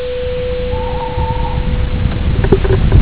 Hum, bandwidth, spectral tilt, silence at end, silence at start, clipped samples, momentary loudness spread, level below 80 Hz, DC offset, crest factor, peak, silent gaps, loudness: none; 4 kHz; -11.5 dB/octave; 0 s; 0 s; 0.6%; 7 LU; -16 dBFS; 4%; 14 dB; 0 dBFS; none; -16 LUFS